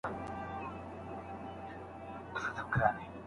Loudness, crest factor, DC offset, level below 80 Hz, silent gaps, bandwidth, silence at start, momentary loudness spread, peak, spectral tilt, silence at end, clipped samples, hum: -39 LUFS; 24 dB; under 0.1%; -58 dBFS; none; 11.5 kHz; 0.05 s; 14 LU; -14 dBFS; -7 dB/octave; 0 s; under 0.1%; none